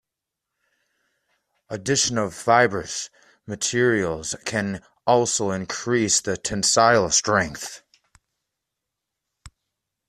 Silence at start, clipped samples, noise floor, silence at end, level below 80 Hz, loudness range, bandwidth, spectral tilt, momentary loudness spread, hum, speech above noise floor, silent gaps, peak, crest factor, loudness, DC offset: 1.7 s; under 0.1%; -85 dBFS; 0.6 s; -56 dBFS; 4 LU; 14 kHz; -3 dB/octave; 14 LU; none; 63 dB; none; -2 dBFS; 22 dB; -21 LUFS; under 0.1%